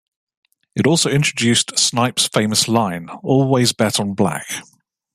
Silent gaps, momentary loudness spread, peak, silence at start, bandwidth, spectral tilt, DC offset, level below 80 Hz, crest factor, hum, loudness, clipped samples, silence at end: none; 11 LU; 0 dBFS; 0.75 s; 15.5 kHz; -3.5 dB/octave; under 0.1%; -58 dBFS; 18 dB; none; -17 LUFS; under 0.1%; 0.5 s